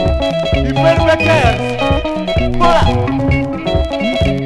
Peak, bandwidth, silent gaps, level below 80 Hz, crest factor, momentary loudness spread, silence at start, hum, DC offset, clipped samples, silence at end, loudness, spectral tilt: 0 dBFS; 12 kHz; none; -22 dBFS; 12 dB; 6 LU; 0 s; none; under 0.1%; under 0.1%; 0 s; -14 LUFS; -6.5 dB/octave